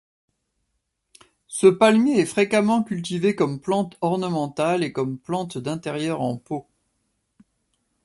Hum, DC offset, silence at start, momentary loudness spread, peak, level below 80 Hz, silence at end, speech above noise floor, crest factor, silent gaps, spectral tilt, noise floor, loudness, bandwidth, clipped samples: none; under 0.1%; 1.5 s; 12 LU; -4 dBFS; -64 dBFS; 1.45 s; 54 dB; 20 dB; none; -5.5 dB/octave; -76 dBFS; -22 LUFS; 11.5 kHz; under 0.1%